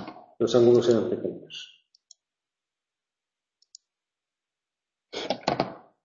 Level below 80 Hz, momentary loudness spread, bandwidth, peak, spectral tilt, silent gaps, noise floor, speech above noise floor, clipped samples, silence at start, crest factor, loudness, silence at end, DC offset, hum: -66 dBFS; 21 LU; 7.4 kHz; -6 dBFS; -6 dB/octave; none; -90 dBFS; 67 dB; under 0.1%; 0 s; 22 dB; -24 LUFS; 0.25 s; under 0.1%; none